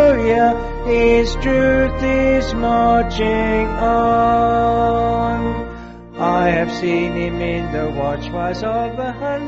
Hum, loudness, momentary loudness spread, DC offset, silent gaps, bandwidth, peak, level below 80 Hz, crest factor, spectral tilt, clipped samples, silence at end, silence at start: none; -17 LUFS; 8 LU; under 0.1%; none; 8 kHz; -2 dBFS; -28 dBFS; 14 dB; -5 dB/octave; under 0.1%; 0 s; 0 s